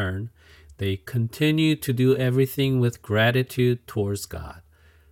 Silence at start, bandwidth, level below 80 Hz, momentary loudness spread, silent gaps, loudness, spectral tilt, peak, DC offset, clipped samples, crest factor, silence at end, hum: 0 s; 17 kHz; -54 dBFS; 13 LU; none; -23 LUFS; -6.5 dB/octave; -8 dBFS; under 0.1%; under 0.1%; 16 dB; 0.5 s; none